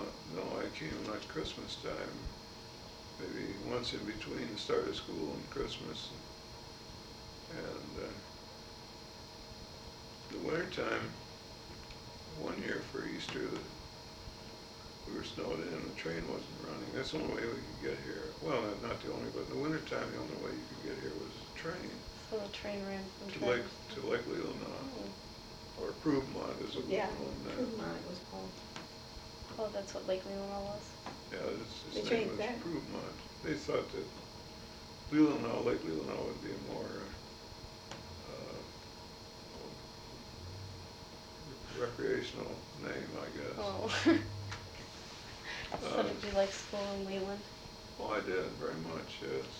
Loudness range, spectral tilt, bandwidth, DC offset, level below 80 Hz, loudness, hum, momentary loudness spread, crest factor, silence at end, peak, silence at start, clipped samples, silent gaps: 9 LU; -5 dB/octave; 18 kHz; under 0.1%; -58 dBFS; -41 LUFS; none; 14 LU; 22 dB; 0 s; -18 dBFS; 0 s; under 0.1%; none